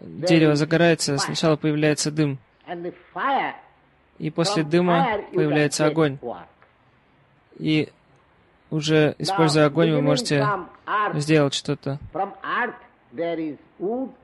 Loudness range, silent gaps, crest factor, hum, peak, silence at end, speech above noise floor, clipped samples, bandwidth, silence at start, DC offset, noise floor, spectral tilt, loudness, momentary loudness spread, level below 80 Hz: 4 LU; none; 16 dB; none; -6 dBFS; 0.15 s; 37 dB; under 0.1%; 12 kHz; 0.05 s; under 0.1%; -59 dBFS; -5.5 dB/octave; -22 LUFS; 14 LU; -60 dBFS